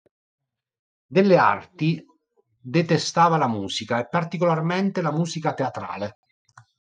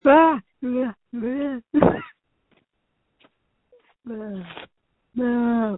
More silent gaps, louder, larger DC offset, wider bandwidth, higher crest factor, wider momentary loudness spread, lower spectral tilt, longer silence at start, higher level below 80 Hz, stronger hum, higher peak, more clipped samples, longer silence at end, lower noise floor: neither; about the same, -22 LUFS vs -23 LUFS; neither; first, 9.4 kHz vs 4 kHz; second, 18 dB vs 24 dB; second, 11 LU vs 20 LU; second, -6 dB/octave vs -11 dB/octave; first, 1.1 s vs 0.05 s; second, -70 dBFS vs -54 dBFS; neither; second, -4 dBFS vs 0 dBFS; neither; first, 0.8 s vs 0 s; second, -67 dBFS vs -74 dBFS